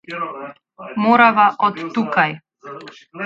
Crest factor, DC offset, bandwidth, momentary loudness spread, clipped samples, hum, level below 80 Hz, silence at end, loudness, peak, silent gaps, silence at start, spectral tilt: 18 dB; under 0.1%; 7.6 kHz; 24 LU; under 0.1%; none; -68 dBFS; 0 s; -16 LUFS; 0 dBFS; none; 0.1 s; -6.5 dB/octave